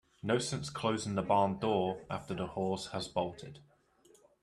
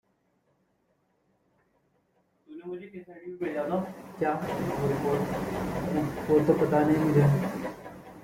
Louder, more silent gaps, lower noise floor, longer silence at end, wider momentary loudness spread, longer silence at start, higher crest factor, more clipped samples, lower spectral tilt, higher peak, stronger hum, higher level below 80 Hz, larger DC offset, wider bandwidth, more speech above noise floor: second, -34 LUFS vs -27 LUFS; neither; second, -65 dBFS vs -72 dBFS; first, 0.8 s vs 0 s; second, 10 LU vs 19 LU; second, 0.25 s vs 2.5 s; about the same, 20 dB vs 20 dB; neither; second, -5 dB/octave vs -8 dB/octave; second, -16 dBFS vs -10 dBFS; neither; second, -66 dBFS vs -56 dBFS; neither; second, 12.5 kHz vs 16.5 kHz; second, 31 dB vs 45 dB